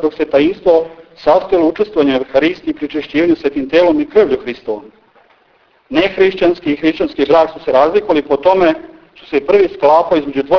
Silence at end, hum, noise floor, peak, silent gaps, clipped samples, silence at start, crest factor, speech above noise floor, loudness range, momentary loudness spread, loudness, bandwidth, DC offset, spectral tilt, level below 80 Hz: 0 s; none; -53 dBFS; 0 dBFS; none; under 0.1%; 0 s; 14 dB; 40 dB; 3 LU; 8 LU; -13 LUFS; 5.4 kHz; under 0.1%; -6.5 dB/octave; -46 dBFS